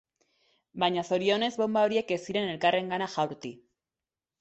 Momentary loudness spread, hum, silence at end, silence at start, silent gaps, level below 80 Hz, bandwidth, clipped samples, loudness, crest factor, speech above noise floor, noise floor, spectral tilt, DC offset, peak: 7 LU; none; 0.85 s; 0.75 s; none; -72 dBFS; 8.2 kHz; under 0.1%; -28 LUFS; 18 dB; over 62 dB; under -90 dBFS; -5 dB/octave; under 0.1%; -12 dBFS